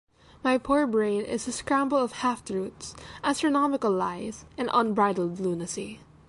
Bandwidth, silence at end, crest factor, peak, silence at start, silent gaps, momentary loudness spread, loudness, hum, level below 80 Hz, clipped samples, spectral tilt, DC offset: 11.5 kHz; 0.3 s; 18 dB; -10 dBFS; 0.45 s; none; 12 LU; -27 LUFS; none; -58 dBFS; under 0.1%; -4.5 dB/octave; under 0.1%